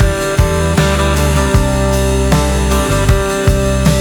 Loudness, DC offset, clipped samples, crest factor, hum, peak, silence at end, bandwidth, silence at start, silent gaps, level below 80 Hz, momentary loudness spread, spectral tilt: -13 LUFS; under 0.1%; under 0.1%; 12 dB; none; 0 dBFS; 0 s; over 20 kHz; 0 s; none; -16 dBFS; 1 LU; -5.5 dB/octave